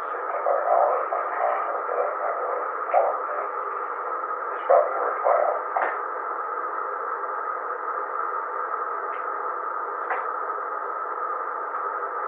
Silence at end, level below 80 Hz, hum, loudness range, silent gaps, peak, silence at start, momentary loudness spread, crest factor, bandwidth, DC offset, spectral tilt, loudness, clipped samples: 0 s; under -90 dBFS; none; 4 LU; none; -4 dBFS; 0 s; 8 LU; 22 dB; 3.8 kHz; under 0.1%; 1 dB/octave; -26 LUFS; under 0.1%